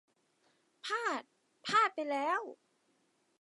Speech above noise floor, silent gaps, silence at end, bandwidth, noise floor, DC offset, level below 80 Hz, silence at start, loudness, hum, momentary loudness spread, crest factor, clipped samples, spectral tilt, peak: 39 dB; none; 0.85 s; 11.5 kHz; -75 dBFS; under 0.1%; under -90 dBFS; 0.85 s; -34 LUFS; none; 16 LU; 22 dB; under 0.1%; -2.5 dB/octave; -16 dBFS